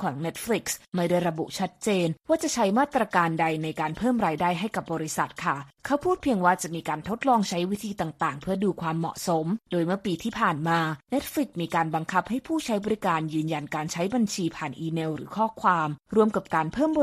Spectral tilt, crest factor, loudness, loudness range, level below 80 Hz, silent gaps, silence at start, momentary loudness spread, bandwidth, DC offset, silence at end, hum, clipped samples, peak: -5 dB/octave; 18 dB; -27 LUFS; 2 LU; -58 dBFS; 0.88-0.92 s; 0 s; 7 LU; 15 kHz; under 0.1%; 0 s; none; under 0.1%; -8 dBFS